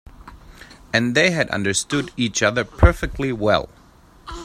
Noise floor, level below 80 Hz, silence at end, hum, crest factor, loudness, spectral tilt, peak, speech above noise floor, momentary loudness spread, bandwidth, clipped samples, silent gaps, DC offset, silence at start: -49 dBFS; -30 dBFS; 0 s; none; 20 dB; -20 LUFS; -4.5 dB/octave; 0 dBFS; 30 dB; 8 LU; 15 kHz; under 0.1%; none; under 0.1%; 0.2 s